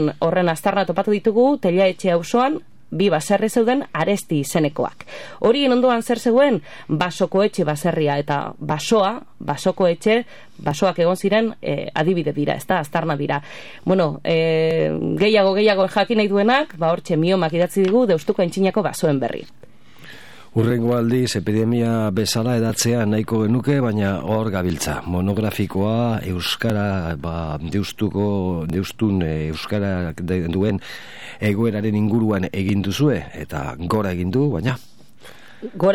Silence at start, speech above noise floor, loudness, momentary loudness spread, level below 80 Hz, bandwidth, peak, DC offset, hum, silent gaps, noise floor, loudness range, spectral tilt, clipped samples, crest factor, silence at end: 0 s; 27 dB; -20 LUFS; 9 LU; -46 dBFS; 17 kHz; -4 dBFS; 0.9%; none; none; -46 dBFS; 5 LU; -6 dB/octave; under 0.1%; 16 dB; 0 s